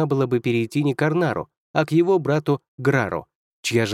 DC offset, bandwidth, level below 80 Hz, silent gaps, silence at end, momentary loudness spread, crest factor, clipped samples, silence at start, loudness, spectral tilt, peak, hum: under 0.1%; 15.5 kHz; -60 dBFS; 1.57-1.74 s, 2.68-2.78 s, 3.35-3.63 s; 0 s; 8 LU; 16 dB; under 0.1%; 0 s; -22 LUFS; -6.5 dB/octave; -4 dBFS; none